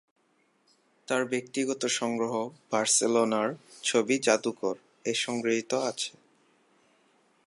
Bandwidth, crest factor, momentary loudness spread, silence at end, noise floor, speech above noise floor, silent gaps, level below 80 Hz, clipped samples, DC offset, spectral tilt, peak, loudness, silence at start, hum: 11.5 kHz; 24 dB; 10 LU; 1.4 s; -69 dBFS; 41 dB; none; -82 dBFS; under 0.1%; under 0.1%; -2.5 dB/octave; -6 dBFS; -28 LUFS; 1.1 s; none